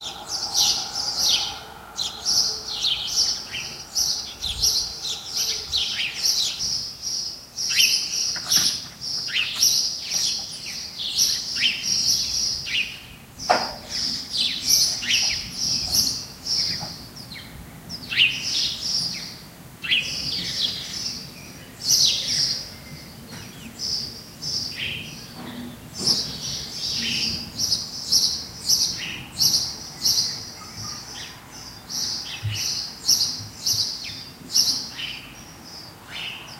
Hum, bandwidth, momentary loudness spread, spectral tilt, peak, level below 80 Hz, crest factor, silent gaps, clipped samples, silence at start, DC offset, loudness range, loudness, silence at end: none; 16 kHz; 18 LU; 0 dB/octave; -4 dBFS; -52 dBFS; 22 dB; none; under 0.1%; 0 s; under 0.1%; 5 LU; -22 LUFS; 0 s